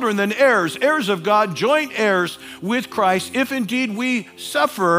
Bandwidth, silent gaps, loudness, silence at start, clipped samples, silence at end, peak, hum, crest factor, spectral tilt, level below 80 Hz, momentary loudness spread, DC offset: 16 kHz; none; -19 LUFS; 0 s; under 0.1%; 0 s; -2 dBFS; none; 16 dB; -4.5 dB/octave; -68 dBFS; 7 LU; under 0.1%